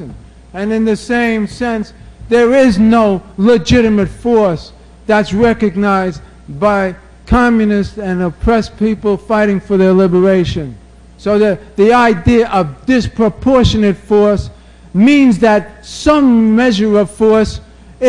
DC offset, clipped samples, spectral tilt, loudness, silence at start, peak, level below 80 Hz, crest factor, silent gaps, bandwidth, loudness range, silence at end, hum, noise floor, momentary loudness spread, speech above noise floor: under 0.1%; under 0.1%; -6.5 dB/octave; -12 LUFS; 0 s; 0 dBFS; -30 dBFS; 12 dB; none; 11 kHz; 3 LU; 0 s; none; -33 dBFS; 11 LU; 22 dB